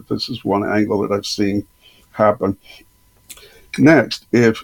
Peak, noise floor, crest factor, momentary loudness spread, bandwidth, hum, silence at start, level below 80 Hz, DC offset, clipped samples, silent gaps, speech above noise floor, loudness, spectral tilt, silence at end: 0 dBFS; -44 dBFS; 18 dB; 13 LU; 18.5 kHz; none; 0.1 s; -52 dBFS; under 0.1%; under 0.1%; none; 27 dB; -17 LUFS; -6 dB/octave; 0 s